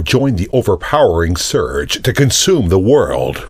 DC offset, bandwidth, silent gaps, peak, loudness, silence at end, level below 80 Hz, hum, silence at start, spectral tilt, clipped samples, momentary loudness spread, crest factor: under 0.1%; 15.5 kHz; none; 0 dBFS; -13 LUFS; 0 s; -30 dBFS; none; 0 s; -4.5 dB/octave; under 0.1%; 5 LU; 12 dB